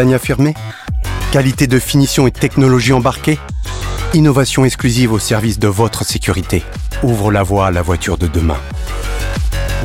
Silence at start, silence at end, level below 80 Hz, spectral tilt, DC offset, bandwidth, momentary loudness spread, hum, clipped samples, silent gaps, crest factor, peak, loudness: 0 s; 0 s; -24 dBFS; -5.5 dB/octave; under 0.1%; 17 kHz; 11 LU; none; under 0.1%; none; 12 dB; 0 dBFS; -14 LUFS